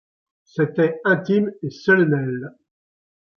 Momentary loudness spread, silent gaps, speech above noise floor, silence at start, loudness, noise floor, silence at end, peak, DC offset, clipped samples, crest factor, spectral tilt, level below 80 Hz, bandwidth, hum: 14 LU; none; over 70 dB; 0.55 s; -20 LUFS; under -90 dBFS; 0.9 s; -4 dBFS; under 0.1%; under 0.1%; 18 dB; -8 dB/octave; -68 dBFS; 6.6 kHz; none